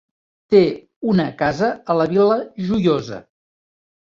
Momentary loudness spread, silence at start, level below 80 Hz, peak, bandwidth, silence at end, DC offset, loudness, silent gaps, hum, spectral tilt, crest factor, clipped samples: 8 LU; 0.5 s; -52 dBFS; -2 dBFS; 7.4 kHz; 0.9 s; under 0.1%; -18 LUFS; 0.96-1.01 s; none; -7.5 dB/octave; 18 dB; under 0.1%